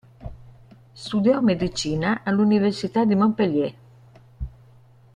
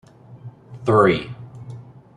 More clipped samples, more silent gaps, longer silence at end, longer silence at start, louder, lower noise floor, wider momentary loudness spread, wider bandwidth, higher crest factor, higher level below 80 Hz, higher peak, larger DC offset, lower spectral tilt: neither; neither; first, 0.65 s vs 0.35 s; about the same, 0.2 s vs 0.3 s; second, -21 LUFS vs -18 LUFS; first, -51 dBFS vs -41 dBFS; second, 19 LU vs 26 LU; about the same, 10 kHz vs 10.5 kHz; about the same, 16 dB vs 20 dB; first, -46 dBFS vs -54 dBFS; second, -8 dBFS vs -2 dBFS; neither; about the same, -6.5 dB/octave vs -7.5 dB/octave